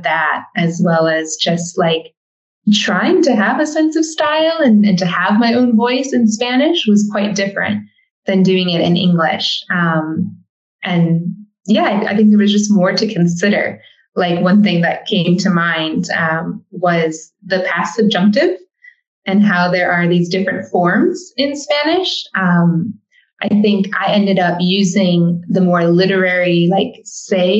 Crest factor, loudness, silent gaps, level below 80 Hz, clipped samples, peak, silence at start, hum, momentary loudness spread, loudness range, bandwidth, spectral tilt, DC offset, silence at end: 12 dB; -14 LUFS; 2.17-2.62 s, 8.11-8.23 s, 10.49-10.79 s, 19.07-19.22 s; -66 dBFS; under 0.1%; -2 dBFS; 0 s; none; 7 LU; 3 LU; 8.2 kHz; -5.5 dB/octave; under 0.1%; 0 s